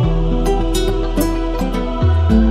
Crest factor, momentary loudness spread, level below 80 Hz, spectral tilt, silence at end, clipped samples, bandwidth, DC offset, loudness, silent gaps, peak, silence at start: 12 dB; 6 LU; -18 dBFS; -7 dB/octave; 0 s; under 0.1%; 15 kHz; under 0.1%; -17 LUFS; none; -2 dBFS; 0 s